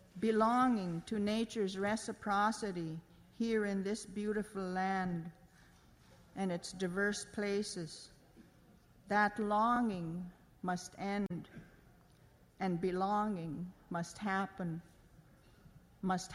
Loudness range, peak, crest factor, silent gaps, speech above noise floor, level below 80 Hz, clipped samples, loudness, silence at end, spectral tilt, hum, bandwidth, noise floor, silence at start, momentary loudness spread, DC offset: 4 LU; -20 dBFS; 18 dB; none; 28 dB; -66 dBFS; under 0.1%; -37 LUFS; 0 s; -5.5 dB/octave; none; 14.5 kHz; -64 dBFS; 0.15 s; 13 LU; under 0.1%